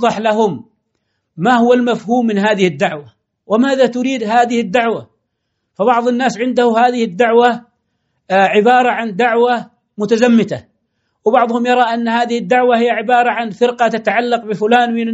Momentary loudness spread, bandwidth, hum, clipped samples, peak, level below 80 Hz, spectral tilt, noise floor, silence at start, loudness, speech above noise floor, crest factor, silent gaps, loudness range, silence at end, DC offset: 8 LU; 8 kHz; none; under 0.1%; 0 dBFS; -64 dBFS; -5.5 dB/octave; -71 dBFS; 0 s; -14 LUFS; 58 dB; 14 dB; none; 2 LU; 0 s; under 0.1%